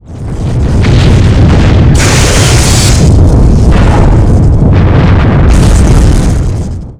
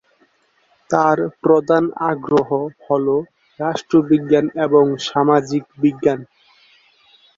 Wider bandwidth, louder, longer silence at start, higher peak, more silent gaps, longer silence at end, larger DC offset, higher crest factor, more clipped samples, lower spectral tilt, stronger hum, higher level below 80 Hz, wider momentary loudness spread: first, 15 kHz vs 7.6 kHz; first, -6 LUFS vs -17 LUFS; second, 0.1 s vs 0.9 s; about the same, 0 dBFS vs 0 dBFS; neither; second, 0.05 s vs 1.15 s; neither; second, 4 dB vs 18 dB; first, 3% vs under 0.1%; about the same, -5.5 dB/octave vs -6.5 dB/octave; neither; first, -8 dBFS vs -60 dBFS; about the same, 6 LU vs 8 LU